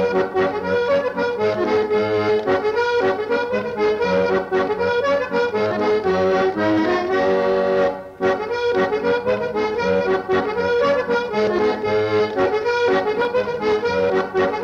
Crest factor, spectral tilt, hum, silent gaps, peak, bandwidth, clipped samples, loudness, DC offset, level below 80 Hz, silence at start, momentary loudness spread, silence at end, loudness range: 12 dB; -6 dB/octave; none; none; -8 dBFS; 7.6 kHz; under 0.1%; -19 LUFS; under 0.1%; -52 dBFS; 0 s; 3 LU; 0 s; 1 LU